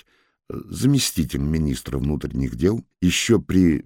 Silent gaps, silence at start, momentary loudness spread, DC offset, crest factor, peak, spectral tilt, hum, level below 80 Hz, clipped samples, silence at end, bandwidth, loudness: none; 0.5 s; 8 LU; under 0.1%; 16 dB; -4 dBFS; -5 dB/octave; none; -36 dBFS; under 0.1%; 0.05 s; 17 kHz; -21 LUFS